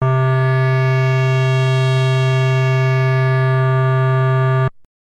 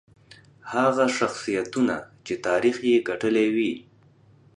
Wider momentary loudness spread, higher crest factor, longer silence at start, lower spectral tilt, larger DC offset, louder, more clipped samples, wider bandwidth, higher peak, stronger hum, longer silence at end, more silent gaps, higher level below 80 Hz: second, 0 LU vs 11 LU; second, 8 dB vs 18 dB; second, 0 s vs 0.65 s; first, -7.5 dB/octave vs -4.5 dB/octave; neither; first, -15 LUFS vs -24 LUFS; neither; second, 7.8 kHz vs 10.5 kHz; about the same, -8 dBFS vs -8 dBFS; neither; second, 0.4 s vs 0.75 s; neither; first, -50 dBFS vs -64 dBFS